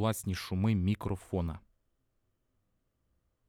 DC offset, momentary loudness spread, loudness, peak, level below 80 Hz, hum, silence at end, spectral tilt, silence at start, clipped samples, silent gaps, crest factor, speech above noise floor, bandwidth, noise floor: under 0.1%; 8 LU; -33 LUFS; -18 dBFS; -54 dBFS; none; 1.9 s; -6.5 dB/octave; 0 s; under 0.1%; none; 16 dB; 45 dB; 17 kHz; -77 dBFS